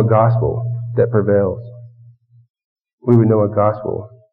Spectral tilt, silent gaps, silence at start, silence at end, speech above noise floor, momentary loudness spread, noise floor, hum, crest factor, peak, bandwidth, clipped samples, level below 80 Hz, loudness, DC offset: -11 dB/octave; 2.50-2.54 s, 2.64-2.76 s, 2.93-2.98 s; 0 s; 0.25 s; 32 dB; 13 LU; -47 dBFS; none; 16 dB; 0 dBFS; 2.7 kHz; under 0.1%; -46 dBFS; -16 LUFS; under 0.1%